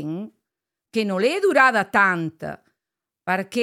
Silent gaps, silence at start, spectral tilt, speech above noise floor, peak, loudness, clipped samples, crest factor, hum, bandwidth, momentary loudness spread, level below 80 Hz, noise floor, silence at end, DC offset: none; 0 s; -5 dB/octave; 66 dB; -2 dBFS; -20 LUFS; under 0.1%; 20 dB; none; 15.5 kHz; 19 LU; -70 dBFS; -86 dBFS; 0 s; under 0.1%